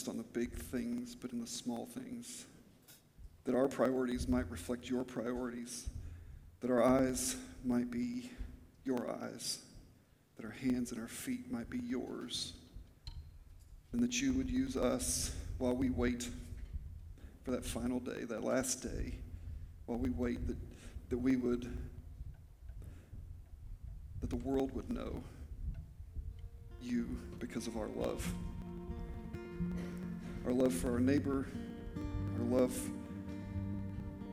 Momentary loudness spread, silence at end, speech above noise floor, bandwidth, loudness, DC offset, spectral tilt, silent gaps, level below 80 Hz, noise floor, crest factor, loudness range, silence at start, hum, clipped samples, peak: 19 LU; 0 s; 29 dB; 16 kHz; -39 LUFS; under 0.1%; -5 dB/octave; none; -50 dBFS; -66 dBFS; 22 dB; 7 LU; 0 s; none; under 0.1%; -16 dBFS